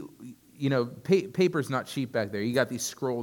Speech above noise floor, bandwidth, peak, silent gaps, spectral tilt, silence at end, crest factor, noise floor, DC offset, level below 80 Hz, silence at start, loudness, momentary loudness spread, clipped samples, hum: 20 dB; 18 kHz; -10 dBFS; none; -5.5 dB/octave; 0 s; 18 dB; -48 dBFS; under 0.1%; -70 dBFS; 0 s; -28 LUFS; 9 LU; under 0.1%; none